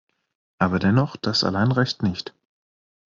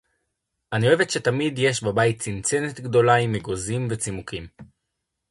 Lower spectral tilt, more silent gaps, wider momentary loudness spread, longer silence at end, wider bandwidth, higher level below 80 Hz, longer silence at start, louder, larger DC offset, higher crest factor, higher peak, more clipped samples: about the same, -5 dB/octave vs -4.5 dB/octave; neither; second, 7 LU vs 10 LU; first, 0.8 s vs 0.65 s; second, 7.4 kHz vs 11.5 kHz; about the same, -56 dBFS vs -52 dBFS; about the same, 0.6 s vs 0.7 s; about the same, -22 LUFS vs -22 LUFS; neither; about the same, 18 dB vs 20 dB; about the same, -6 dBFS vs -4 dBFS; neither